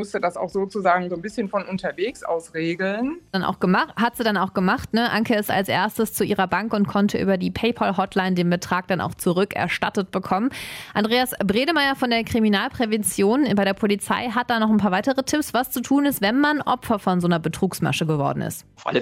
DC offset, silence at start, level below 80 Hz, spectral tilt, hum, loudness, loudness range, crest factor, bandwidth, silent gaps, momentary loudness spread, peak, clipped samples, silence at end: under 0.1%; 0 s; -54 dBFS; -5 dB/octave; none; -22 LUFS; 3 LU; 18 dB; 16 kHz; none; 6 LU; -4 dBFS; under 0.1%; 0 s